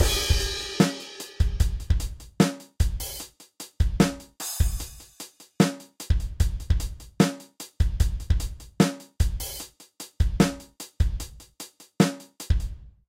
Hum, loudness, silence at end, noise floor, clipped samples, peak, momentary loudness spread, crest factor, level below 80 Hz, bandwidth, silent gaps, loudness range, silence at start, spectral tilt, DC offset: none; -27 LUFS; 0.2 s; -46 dBFS; under 0.1%; -6 dBFS; 18 LU; 20 dB; -30 dBFS; 16.5 kHz; none; 2 LU; 0 s; -5 dB/octave; under 0.1%